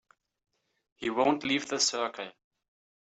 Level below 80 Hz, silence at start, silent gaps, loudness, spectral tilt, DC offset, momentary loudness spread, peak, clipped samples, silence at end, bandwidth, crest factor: -74 dBFS; 1 s; none; -29 LUFS; -2 dB/octave; under 0.1%; 13 LU; -12 dBFS; under 0.1%; 0.7 s; 8.4 kHz; 20 dB